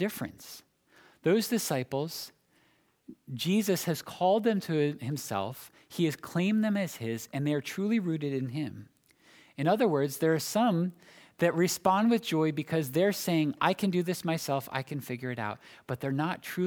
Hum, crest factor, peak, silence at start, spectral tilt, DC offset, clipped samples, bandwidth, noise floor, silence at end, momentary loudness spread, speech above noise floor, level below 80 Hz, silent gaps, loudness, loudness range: none; 22 dB; -8 dBFS; 0 s; -5.5 dB/octave; under 0.1%; under 0.1%; over 20 kHz; -68 dBFS; 0 s; 13 LU; 39 dB; -74 dBFS; none; -30 LUFS; 4 LU